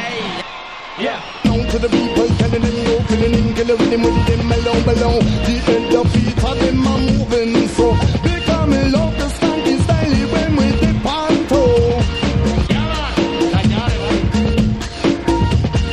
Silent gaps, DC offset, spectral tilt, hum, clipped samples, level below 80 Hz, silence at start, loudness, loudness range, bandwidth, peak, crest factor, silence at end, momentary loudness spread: none; under 0.1%; -6.5 dB/octave; none; under 0.1%; -24 dBFS; 0 s; -16 LUFS; 2 LU; 12 kHz; -2 dBFS; 14 dB; 0 s; 4 LU